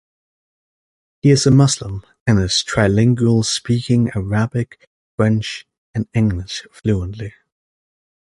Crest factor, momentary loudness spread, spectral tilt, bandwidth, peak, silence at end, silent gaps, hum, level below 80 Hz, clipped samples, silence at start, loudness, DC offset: 16 dB; 15 LU; -5.5 dB/octave; 11.5 kHz; -2 dBFS; 1 s; 2.21-2.26 s, 4.87-5.18 s, 5.78-5.94 s; none; -40 dBFS; under 0.1%; 1.25 s; -17 LUFS; under 0.1%